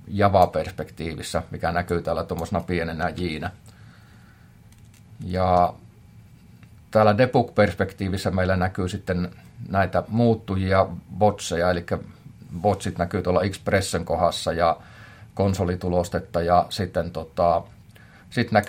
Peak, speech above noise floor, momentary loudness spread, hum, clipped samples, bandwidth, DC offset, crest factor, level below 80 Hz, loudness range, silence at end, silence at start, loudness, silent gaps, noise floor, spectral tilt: -2 dBFS; 27 dB; 11 LU; none; under 0.1%; 16 kHz; under 0.1%; 20 dB; -50 dBFS; 5 LU; 0 s; 0.05 s; -24 LUFS; none; -50 dBFS; -6 dB/octave